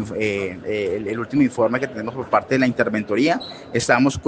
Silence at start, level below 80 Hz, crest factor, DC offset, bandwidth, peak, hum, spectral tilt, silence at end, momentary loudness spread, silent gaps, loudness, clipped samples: 0 s; -52 dBFS; 20 dB; under 0.1%; 9.6 kHz; 0 dBFS; none; -5.5 dB/octave; 0 s; 8 LU; none; -21 LUFS; under 0.1%